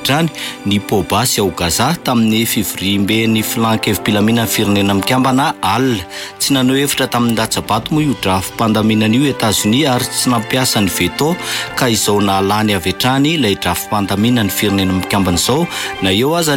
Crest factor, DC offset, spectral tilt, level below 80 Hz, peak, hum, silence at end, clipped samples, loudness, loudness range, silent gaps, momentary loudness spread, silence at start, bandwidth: 10 dB; under 0.1%; -4 dB/octave; -42 dBFS; -4 dBFS; none; 0 s; under 0.1%; -14 LUFS; 1 LU; none; 4 LU; 0 s; 17 kHz